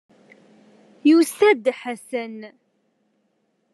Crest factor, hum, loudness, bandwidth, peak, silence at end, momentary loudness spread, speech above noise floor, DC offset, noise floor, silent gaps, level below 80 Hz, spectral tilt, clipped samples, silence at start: 18 dB; none; -20 LUFS; 12.5 kHz; -6 dBFS; 1.25 s; 17 LU; 50 dB; under 0.1%; -69 dBFS; none; -84 dBFS; -3.5 dB/octave; under 0.1%; 1.05 s